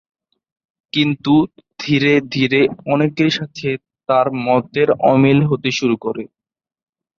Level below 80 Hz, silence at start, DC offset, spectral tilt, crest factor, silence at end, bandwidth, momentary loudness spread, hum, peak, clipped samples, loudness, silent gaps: -56 dBFS; 0.95 s; under 0.1%; -6.5 dB/octave; 16 dB; 0.9 s; 7.2 kHz; 11 LU; none; -2 dBFS; under 0.1%; -16 LUFS; none